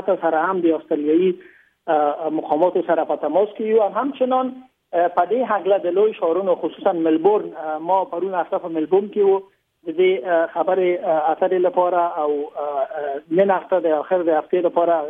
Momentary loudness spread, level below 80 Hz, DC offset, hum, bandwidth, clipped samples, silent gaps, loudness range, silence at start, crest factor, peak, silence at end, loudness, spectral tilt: 6 LU; -74 dBFS; under 0.1%; none; 3.8 kHz; under 0.1%; none; 1 LU; 0 s; 14 dB; -4 dBFS; 0 s; -20 LUFS; -9 dB/octave